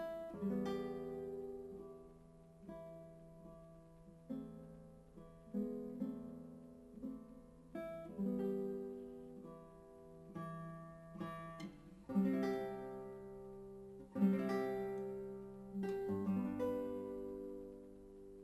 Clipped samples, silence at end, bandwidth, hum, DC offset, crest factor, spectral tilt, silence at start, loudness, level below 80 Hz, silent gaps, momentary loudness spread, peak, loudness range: under 0.1%; 0 s; 13.5 kHz; none; under 0.1%; 20 dB; -8.5 dB/octave; 0 s; -44 LUFS; -68 dBFS; none; 20 LU; -24 dBFS; 12 LU